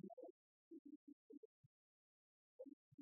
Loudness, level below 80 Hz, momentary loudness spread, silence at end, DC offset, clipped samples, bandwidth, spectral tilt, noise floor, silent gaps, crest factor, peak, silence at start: -63 LUFS; under -90 dBFS; 4 LU; 0 s; under 0.1%; under 0.1%; 1 kHz; 3.5 dB/octave; under -90 dBFS; 0.13-0.17 s, 0.30-0.71 s, 0.79-0.85 s, 0.96-1.07 s, 1.13-1.30 s, 1.37-2.59 s, 2.73-2.98 s; 18 dB; -46 dBFS; 0.05 s